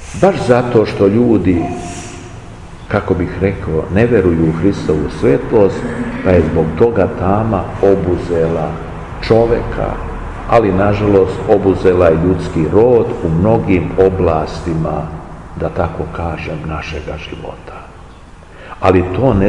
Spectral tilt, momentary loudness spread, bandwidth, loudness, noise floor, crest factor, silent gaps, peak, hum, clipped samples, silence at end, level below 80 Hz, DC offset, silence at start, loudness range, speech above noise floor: -8 dB/octave; 15 LU; 11 kHz; -14 LUFS; -36 dBFS; 14 dB; none; 0 dBFS; none; under 0.1%; 0 s; -30 dBFS; 0.4%; 0 s; 8 LU; 23 dB